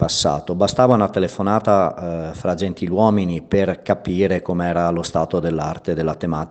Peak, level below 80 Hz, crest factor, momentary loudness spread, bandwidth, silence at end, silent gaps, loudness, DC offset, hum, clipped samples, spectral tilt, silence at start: 0 dBFS; -46 dBFS; 18 dB; 8 LU; 9 kHz; 0 s; none; -19 LUFS; under 0.1%; none; under 0.1%; -6 dB/octave; 0 s